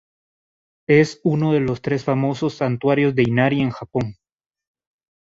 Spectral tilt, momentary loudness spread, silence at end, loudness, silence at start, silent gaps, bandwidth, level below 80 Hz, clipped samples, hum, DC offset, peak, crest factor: -7.5 dB/octave; 9 LU; 1.1 s; -19 LUFS; 0.9 s; none; 7.8 kHz; -54 dBFS; under 0.1%; none; under 0.1%; -2 dBFS; 18 dB